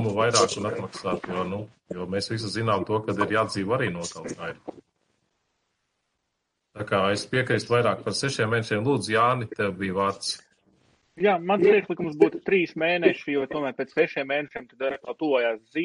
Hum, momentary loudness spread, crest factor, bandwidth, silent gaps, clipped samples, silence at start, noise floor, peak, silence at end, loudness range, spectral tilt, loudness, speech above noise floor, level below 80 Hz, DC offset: none; 12 LU; 22 dB; 10.5 kHz; none; under 0.1%; 0 s; -79 dBFS; -4 dBFS; 0 s; 7 LU; -4.5 dB/octave; -25 LUFS; 54 dB; -64 dBFS; under 0.1%